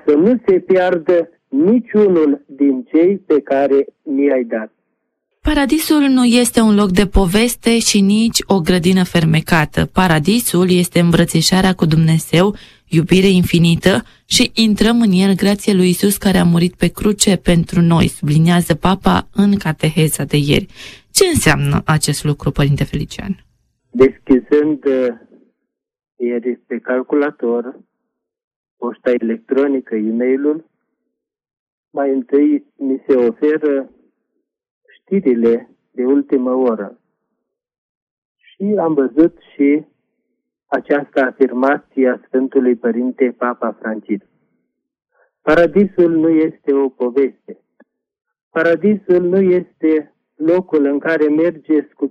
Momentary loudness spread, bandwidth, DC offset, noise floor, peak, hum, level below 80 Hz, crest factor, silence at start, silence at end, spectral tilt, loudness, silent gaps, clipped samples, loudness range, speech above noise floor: 9 LU; 15 kHz; under 0.1%; -76 dBFS; 0 dBFS; none; -36 dBFS; 14 dB; 0.05 s; 0 s; -5.5 dB/octave; -15 LUFS; 28.44-28.64 s, 28.71-28.77 s, 31.59-31.84 s, 34.71-34.81 s, 37.78-38.35 s, 48.43-48.51 s; under 0.1%; 6 LU; 62 dB